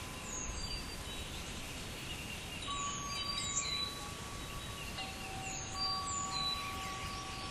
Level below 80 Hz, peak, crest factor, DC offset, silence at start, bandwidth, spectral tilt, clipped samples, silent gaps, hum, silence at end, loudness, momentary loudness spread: -52 dBFS; -22 dBFS; 20 dB; under 0.1%; 0 s; 15.5 kHz; -2 dB/octave; under 0.1%; none; none; 0 s; -39 LUFS; 8 LU